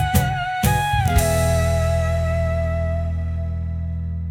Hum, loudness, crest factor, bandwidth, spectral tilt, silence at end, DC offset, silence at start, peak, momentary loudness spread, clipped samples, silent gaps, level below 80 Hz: none; -21 LUFS; 16 dB; 18 kHz; -5.5 dB/octave; 0 s; under 0.1%; 0 s; -4 dBFS; 8 LU; under 0.1%; none; -30 dBFS